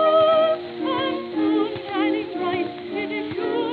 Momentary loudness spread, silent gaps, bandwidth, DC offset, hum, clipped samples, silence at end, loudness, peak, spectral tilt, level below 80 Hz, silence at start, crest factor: 10 LU; none; 4.8 kHz; under 0.1%; none; under 0.1%; 0 s; -23 LUFS; -8 dBFS; -8 dB/octave; -66 dBFS; 0 s; 14 dB